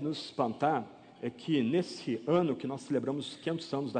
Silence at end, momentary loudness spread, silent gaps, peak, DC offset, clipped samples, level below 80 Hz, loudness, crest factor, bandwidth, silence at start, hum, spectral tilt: 0 s; 9 LU; none; -16 dBFS; under 0.1%; under 0.1%; -76 dBFS; -33 LUFS; 18 dB; 9.4 kHz; 0 s; none; -6.5 dB/octave